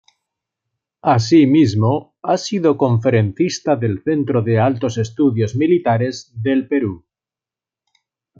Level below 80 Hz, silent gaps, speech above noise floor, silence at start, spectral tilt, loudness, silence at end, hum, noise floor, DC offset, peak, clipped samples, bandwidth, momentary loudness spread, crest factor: -58 dBFS; none; 73 dB; 1.05 s; -7 dB/octave; -17 LUFS; 1.4 s; none; -89 dBFS; under 0.1%; -2 dBFS; under 0.1%; 7.6 kHz; 8 LU; 16 dB